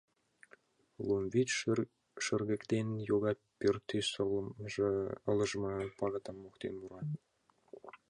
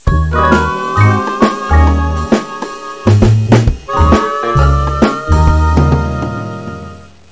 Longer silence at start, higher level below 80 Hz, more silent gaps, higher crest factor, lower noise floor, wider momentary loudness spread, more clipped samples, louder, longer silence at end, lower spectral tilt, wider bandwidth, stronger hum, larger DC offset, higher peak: first, 1 s vs 0.05 s; second, -66 dBFS vs -16 dBFS; neither; first, 18 dB vs 12 dB; first, -66 dBFS vs -32 dBFS; about the same, 11 LU vs 13 LU; second, under 0.1% vs 0.5%; second, -36 LUFS vs -12 LUFS; second, 0.15 s vs 0.3 s; second, -5 dB/octave vs -7 dB/octave; first, 11 kHz vs 8 kHz; neither; second, under 0.1% vs 0.7%; second, -20 dBFS vs 0 dBFS